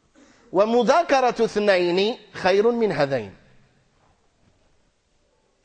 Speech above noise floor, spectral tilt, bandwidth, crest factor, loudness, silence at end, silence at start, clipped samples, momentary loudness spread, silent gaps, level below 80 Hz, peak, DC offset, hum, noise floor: 45 dB; -5 dB/octave; 9.4 kHz; 16 dB; -21 LUFS; 2.35 s; 0.55 s; under 0.1%; 7 LU; none; -60 dBFS; -6 dBFS; under 0.1%; none; -65 dBFS